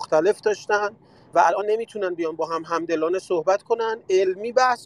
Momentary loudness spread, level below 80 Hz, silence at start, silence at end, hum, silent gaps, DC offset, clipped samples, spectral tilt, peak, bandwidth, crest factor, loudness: 7 LU; -72 dBFS; 0 s; 0 s; none; none; under 0.1%; under 0.1%; -4 dB/octave; -4 dBFS; 11.5 kHz; 18 dB; -23 LUFS